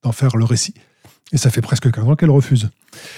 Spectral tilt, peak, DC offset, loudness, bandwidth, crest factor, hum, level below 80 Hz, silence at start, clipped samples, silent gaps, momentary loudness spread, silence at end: -6 dB/octave; -2 dBFS; under 0.1%; -16 LUFS; 15 kHz; 14 dB; none; -48 dBFS; 0.05 s; under 0.1%; none; 8 LU; 0 s